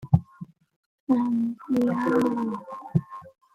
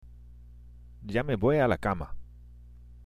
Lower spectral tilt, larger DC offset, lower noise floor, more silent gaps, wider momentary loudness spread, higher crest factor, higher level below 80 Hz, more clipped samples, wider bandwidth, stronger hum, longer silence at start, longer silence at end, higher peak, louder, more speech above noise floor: about the same, -9 dB/octave vs -8 dB/octave; neither; second, -45 dBFS vs -49 dBFS; first, 0.76-1.07 s vs none; about the same, 21 LU vs 21 LU; about the same, 22 dB vs 20 dB; second, -58 dBFS vs -46 dBFS; neither; second, 12 kHz vs 15 kHz; second, none vs 60 Hz at -45 dBFS; about the same, 0 s vs 0.05 s; first, 0.25 s vs 0.05 s; first, -4 dBFS vs -12 dBFS; about the same, -26 LUFS vs -28 LUFS; about the same, 21 dB vs 23 dB